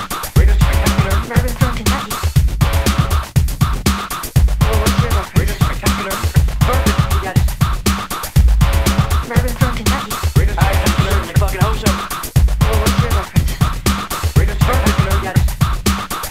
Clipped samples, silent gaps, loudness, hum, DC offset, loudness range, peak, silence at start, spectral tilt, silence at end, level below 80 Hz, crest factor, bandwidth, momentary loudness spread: under 0.1%; none; -16 LUFS; none; 1%; 1 LU; 0 dBFS; 0 s; -5 dB/octave; 0 s; -18 dBFS; 14 dB; 16.5 kHz; 4 LU